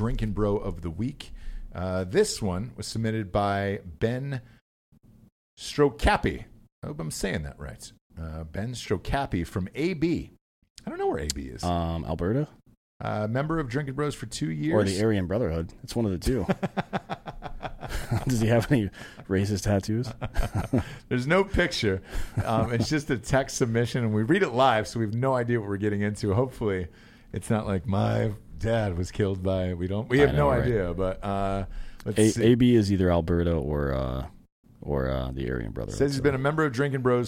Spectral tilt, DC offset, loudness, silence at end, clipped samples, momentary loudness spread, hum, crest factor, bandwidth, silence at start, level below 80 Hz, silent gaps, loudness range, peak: -6 dB/octave; under 0.1%; -27 LUFS; 0 s; under 0.1%; 14 LU; none; 22 dB; 16 kHz; 0 s; -40 dBFS; 4.61-4.92 s, 5.32-5.57 s, 6.72-6.82 s, 8.01-8.10 s, 10.41-10.62 s, 10.70-10.75 s, 12.77-13.00 s, 34.52-34.63 s; 6 LU; -4 dBFS